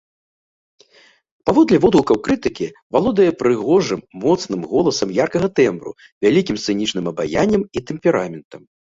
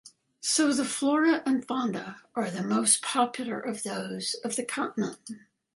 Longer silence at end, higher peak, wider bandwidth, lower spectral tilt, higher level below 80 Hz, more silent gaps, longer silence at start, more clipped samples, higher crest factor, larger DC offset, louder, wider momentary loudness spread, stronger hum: about the same, 0.35 s vs 0.35 s; first, 0 dBFS vs -8 dBFS; second, 7.8 kHz vs 11.5 kHz; first, -5.5 dB/octave vs -3 dB/octave; first, -48 dBFS vs -76 dBFS; first, 2.82-2.90 s, 6.12-6.21 s, 8.45-8.51 s vs none; first, 1.45 s vs 0.05 s; neither; about the same, 18 dB vs 22 dB; neither; first, -18 LUFS vs -28 LUFS; about the same, 10 LU vs 11 LU; neither